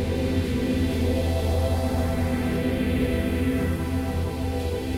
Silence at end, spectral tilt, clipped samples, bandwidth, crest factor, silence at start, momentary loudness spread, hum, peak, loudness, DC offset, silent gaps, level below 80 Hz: 0 s; -7 dB/octave; under 0.1%; 16 kHz; 12 dB; 0 s; 3 LU; none; -12 dBFS; -25 LUFS; under 0.1%; none; -32 dBFS